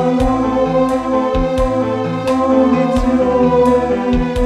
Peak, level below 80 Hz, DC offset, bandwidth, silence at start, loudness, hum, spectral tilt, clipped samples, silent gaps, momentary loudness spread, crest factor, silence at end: 0 dBFS; -26 dBFS; under 0.1%; 11.5 kHz; 0 s; -15 LUFS; none; -7.5 dB/octave; under 0.1%; none; 4 LU; 14 dB; 0 s